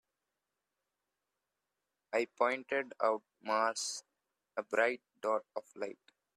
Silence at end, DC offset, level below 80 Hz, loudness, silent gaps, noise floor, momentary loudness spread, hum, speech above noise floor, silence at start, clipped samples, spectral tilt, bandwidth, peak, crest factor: 0.4 s; under 0.1%; -88 dBFS; -36 LUFS; none; -89 dBFS; 12 LU; 50 Hz at -90 dBFS; 53 dB; 2.1 s; under 0.1%; -1.5 dB/octave; 14 kHz; -14 dBFS; 24 dB